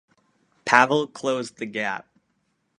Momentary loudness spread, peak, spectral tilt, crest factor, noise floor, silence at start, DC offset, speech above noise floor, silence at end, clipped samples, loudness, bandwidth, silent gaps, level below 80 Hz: 15 LU; 0 dBFS; -4 dB/octave; 26 dB; -72 dBFS; 0.65 s; under 0.1%; 49 dB; 0.8 s; under 0.1%; -22 LUFS; 11 kHz; none; -72 dBFS